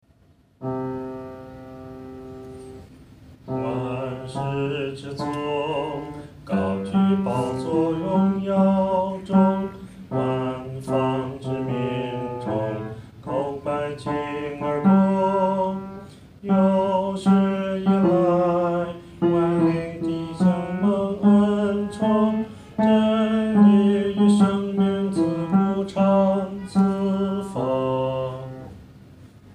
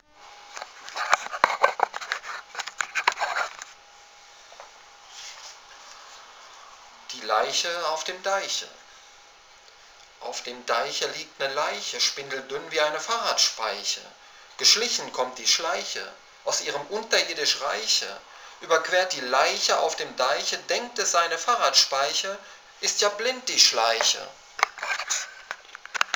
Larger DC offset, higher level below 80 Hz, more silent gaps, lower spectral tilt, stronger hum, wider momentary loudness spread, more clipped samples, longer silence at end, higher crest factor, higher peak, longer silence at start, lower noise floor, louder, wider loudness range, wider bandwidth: neither; first, -54 dBFS vs -72 dBFS; neither; first, -8 dB/octave vs 1 dB/octave; neither; second, 17 LU vs 20 LU; neither; about the same, 0 s vs 0 s; second, 16 dB vs 28 dB; second, -6 dBFS vs 0 dBFS; first, 0.6 s vs 0.2 s; first, -57 dBFS vs -52 dBFS; about the same, -22 LUFS vs -24 LUFS; about the same, 9 LU vs 9 LU; second, 10 kHz vs over 20 kHz